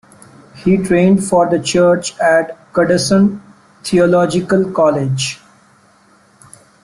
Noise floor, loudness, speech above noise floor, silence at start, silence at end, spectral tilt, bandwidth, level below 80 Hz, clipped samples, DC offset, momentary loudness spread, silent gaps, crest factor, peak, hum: -50 dBFS; -14 LUFS; 37 dB; 0.55 s; 1.5 s; -5.5 dB/octave; 12.5 kHz; -50 dBFS; under 0.1%; under 0.1%; 8 LU; none; 14 dB; -2 dBFS; none